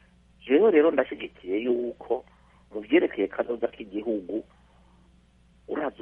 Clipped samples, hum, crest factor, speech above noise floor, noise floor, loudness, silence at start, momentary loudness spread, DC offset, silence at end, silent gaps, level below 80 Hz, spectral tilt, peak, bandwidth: under 0.1%; none; 20 dB; 34 dB; -59 dBFS; -26 LUFS; 0.45 s; 15 LU; under 0.1%; 0.1 s; none; -62 dBFS; -8 dB/octave; -8 dBFS; 3.8 kHz